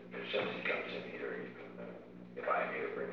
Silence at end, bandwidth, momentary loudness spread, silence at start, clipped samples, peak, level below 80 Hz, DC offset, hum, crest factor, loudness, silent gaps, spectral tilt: 0 s; 7 kHz; 14 LU; 0 s; under 0.1%; -22 dBFS; -76 dBFS; under 0.1%; 60 Hz at -55 dBFS; 18 dB; -39 LUFS; none; -2.5 dB/octave